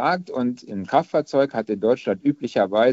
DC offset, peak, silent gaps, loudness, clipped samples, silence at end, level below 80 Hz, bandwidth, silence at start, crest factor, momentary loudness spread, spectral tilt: under 0.1%; -4 dBFS; none; -22 LUFS; under 0.1%; 0 s; -66 dBFS; 8 kHz; 0 s; 18 dB; 5 LU; -5 dB/octave